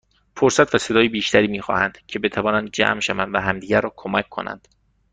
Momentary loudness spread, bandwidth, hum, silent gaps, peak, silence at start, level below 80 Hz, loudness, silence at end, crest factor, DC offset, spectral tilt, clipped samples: 8 LU; 9.6 kHz; none; none; -2 dBFS; 0.35 s; -52 dBFS; -20 LUFS; 0.55 s; 20 dB; under 0.1%; -4 dB/octave; under 0.1%